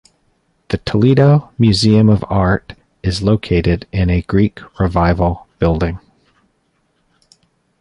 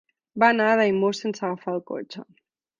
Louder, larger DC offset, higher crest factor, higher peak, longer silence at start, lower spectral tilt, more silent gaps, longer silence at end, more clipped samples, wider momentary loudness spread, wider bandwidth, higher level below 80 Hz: first, -15 LUFS vs -22 LUFS; neither; second, 14 dB vs 20 dB; first, 0 dBFS vs -4 dBFS; first, 0.7 s vs 0.35 s; first, -7.5 dB/octave vs -5.5 dB/octave; neither; first, 1.85 s vs 0.55 s; neither; second, 10 LU vs 20 LU; first, 11.5 kHz vs 7.6 kHz; first, -30 dBFS vs -70 dBFS